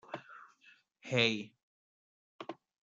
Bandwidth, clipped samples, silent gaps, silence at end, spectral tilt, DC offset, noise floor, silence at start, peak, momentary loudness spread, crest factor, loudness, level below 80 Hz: 7.8 kHz; under 0.1%; 1.63-2.39 s; 0.3 s; -4.5 dB/octave; under 0.1%; -66 dBFS; 0.1 s; -14 dBFS; 24 LU; 26 dB; -32 LUFS; -82 dBFS